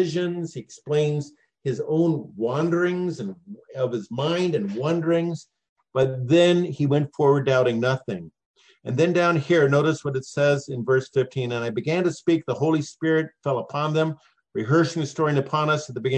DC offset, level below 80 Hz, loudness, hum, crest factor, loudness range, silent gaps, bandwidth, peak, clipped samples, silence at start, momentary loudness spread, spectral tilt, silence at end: under 0.1%; -68 dBFS; -23 LUFS; none; 16 dB; 4 LU; 5.69-5.76 s, 8.45-8.54 s; 9 kHz; -8 dBFS; under 0.1%; 0 s; 12 LU; -6.5 dB/octave; 0 s